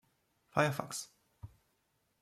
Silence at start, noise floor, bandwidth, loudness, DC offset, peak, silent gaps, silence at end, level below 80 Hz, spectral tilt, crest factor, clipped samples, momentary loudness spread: 0.55 s; -78 dBFS; 15.5 kHz; -35 LUFS; under 0.1%; -14 dBFS; none; 0.75 s; -70 dBFS; -4.5 dB/octave; 26 dB; under 0.1%; 23 LU